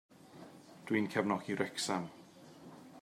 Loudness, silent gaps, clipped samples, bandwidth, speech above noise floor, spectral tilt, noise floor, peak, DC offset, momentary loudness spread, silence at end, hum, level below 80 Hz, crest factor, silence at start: -36 LUFS; none; under 0.1%; 16 kHz; 20 dB; -4.5 dB/octave; -56 dBFS; -18 dBFS; under 0.1%; 22 LU; 0 s; none; -82 dBFS; 22 dB; 0.25 s